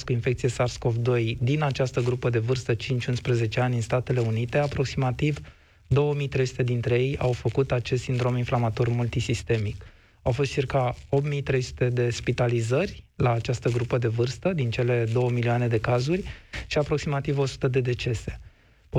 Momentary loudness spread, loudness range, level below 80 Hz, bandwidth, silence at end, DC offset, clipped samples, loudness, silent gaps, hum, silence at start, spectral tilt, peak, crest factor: 3 LU; 1 LU; -46 dBFS; 10 kHz; 0 s; under 0.1%; under 0.1%; -26 LUFS; none; none; 0 s; -6.5 dB/octave; -12 dBFS; 14 dB